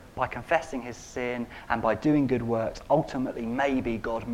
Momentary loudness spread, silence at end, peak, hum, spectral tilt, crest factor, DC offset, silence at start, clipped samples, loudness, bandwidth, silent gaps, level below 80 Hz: 9 LU; 0 s; -8 dBFS; none; -6.5 dB/octave; 20 dB; under 0.1%; 0 s; under 0.1%; -28 LUFS; 14.5 kHz; none; -48 dBFS